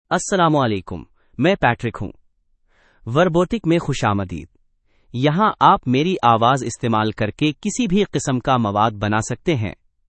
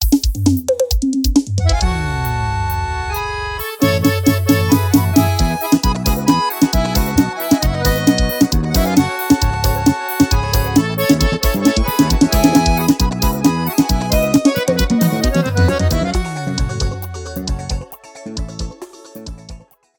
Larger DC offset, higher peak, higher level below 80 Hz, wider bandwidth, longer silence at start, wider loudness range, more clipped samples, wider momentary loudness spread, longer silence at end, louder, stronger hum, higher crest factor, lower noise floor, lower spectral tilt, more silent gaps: neither; about the same, 0 dBFS vs 0 dBFS; second, -44 dBFS vs -22 dBFS; second, 8.8 kHz vs 20 kHz; about the same, 0.1 s vs 0 s; about the same, 4 LU vs 5 LU; neither; about the same, 14 LU vs 12 LU; about the same, 0.35 s vs 0.4 s; second, -19 LUFS vs -16 LUFS; neither; first, 20 dB vs 14 dB; first, -61 dBFS vs -37 dBFS; about the same, -5.5 dB/octave vs -5.5 dB/octave; neither